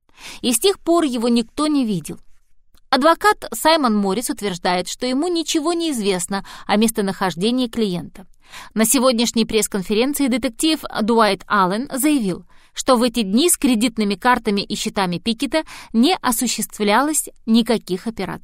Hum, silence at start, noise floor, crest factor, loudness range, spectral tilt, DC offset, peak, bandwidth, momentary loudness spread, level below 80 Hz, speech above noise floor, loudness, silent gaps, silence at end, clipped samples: none; 0.2 s; -50 dBFS; 16 dB; 2 LU; -3.5 dB/octave; 0.1%; -2 dBFS; 16 kHz; 8 LU; -46 dBFS; 31 dB; -19 LUFS; none; 0.05 s; under 0.1%